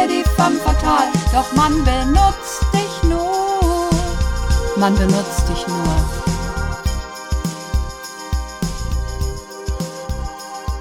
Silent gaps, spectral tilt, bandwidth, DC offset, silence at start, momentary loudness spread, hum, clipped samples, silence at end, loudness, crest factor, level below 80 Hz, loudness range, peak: none; -5.5 dB/octave; 17.5 kHz; under 0.1%; 0 s; 11 LU; none; under 0.1%; 0 s; -19 LUFS; 16 dB; -22 dBFS; 8 LU; 0 dBFS